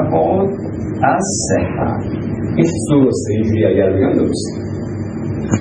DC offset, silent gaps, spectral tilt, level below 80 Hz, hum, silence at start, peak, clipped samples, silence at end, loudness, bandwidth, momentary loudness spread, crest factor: under 0.1%; none; -6.5 dB/octave; -40 dBFS; none; 0 s; 0 dBFS; under 0.1%; 0 s; -16 LUFS; 11.5 kHz; 9 LU; 16 dB